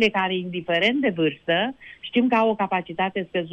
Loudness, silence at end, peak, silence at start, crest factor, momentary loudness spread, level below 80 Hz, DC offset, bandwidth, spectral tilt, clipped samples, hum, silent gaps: -23 LUFS; 0 s; -6 dBFS; 0 s; 16 dB; 7 LU; -62 dBFS; under 0.1%; 8.4 kHz; -6.5 dB/octave; under 0.1%; none; none